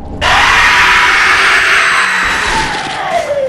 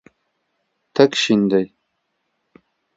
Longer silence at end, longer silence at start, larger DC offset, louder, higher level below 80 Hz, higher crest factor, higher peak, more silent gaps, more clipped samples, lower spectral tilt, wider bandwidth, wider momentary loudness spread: second, 0 s vs 1.3 s; second, 0 s vs 0.95 s; neither; first, -8 LUFS vs -17 LUFS; first, -30 dBFS vs -64 dBFS; second, 10 dB vs 22 dB; about the same, 0 dBFS vs 0 dBFS; neither; neither; second, -1.5 dB/octave vs -5 dB/octave; first, 15.5 kHz vs 8 kHz; about the same, 9 LU vs 11 LU